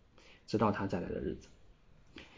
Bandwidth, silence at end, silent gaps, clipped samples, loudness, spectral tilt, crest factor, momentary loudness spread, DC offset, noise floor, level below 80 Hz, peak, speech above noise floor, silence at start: 7.6 kHz; 0 s; none; under 0.1%; -36 LUFS; -7.5 dB/octave; 22 dB; 23 LU; under 0.1%; -61 dBFS; -56 dBFS; -18 dBFS; 26 dB; 0.25 s